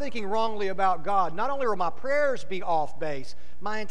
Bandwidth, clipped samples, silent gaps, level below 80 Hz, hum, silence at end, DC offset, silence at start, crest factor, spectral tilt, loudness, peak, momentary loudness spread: 11 kHz; under 0.1%; none; -54 dBFS; none; 0 s; 6%; 0 s; 14 dB; -5 dB/octave; -28 LUFS; -12 dBFS; 9 LU